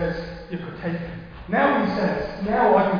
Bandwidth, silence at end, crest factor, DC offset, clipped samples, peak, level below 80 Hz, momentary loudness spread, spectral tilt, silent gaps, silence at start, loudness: 5.2 kHz; 0 s; 16 dB; under 0.1%; under 0.1%; -6 dBFS; -44 dBFS; 14 LU; -8.5 dB/octave; none; 0 s; -23 LUFS